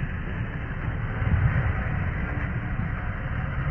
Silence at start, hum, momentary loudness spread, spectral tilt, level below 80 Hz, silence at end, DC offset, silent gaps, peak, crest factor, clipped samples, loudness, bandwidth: 0 s; none; 7 LU; -10 dB/octave; -32 dBFS; 0 s; under 0.1%; none; -10 dBFS; 16 dB; under 0.1%; -28 LUFS; 3.3 kHz